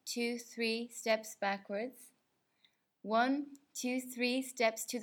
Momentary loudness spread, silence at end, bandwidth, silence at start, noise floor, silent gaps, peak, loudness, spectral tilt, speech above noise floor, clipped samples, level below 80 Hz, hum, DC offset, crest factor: 9 LU; 0 s; 19 kHz; 0.05 s; -79 dBFS; none; -18 dBFS; -36 LUFS; -2.5 dB/octave; 43 dB; under 0.1%; under -90 dBFS; none; under 0.1%; 20 dB